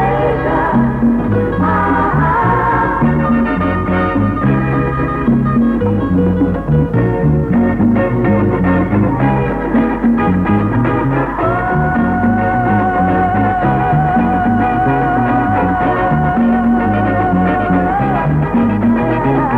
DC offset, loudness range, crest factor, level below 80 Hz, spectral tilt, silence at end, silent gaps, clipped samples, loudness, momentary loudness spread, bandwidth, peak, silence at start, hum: under 0.1%; 1 LU; 12 dB; -28 dBFS; -10 dB/octave; 0 s; none; under 0.1%; -13 LUFS; 2 LU; 4.5 kHz; -2 dBFS; 0 s; none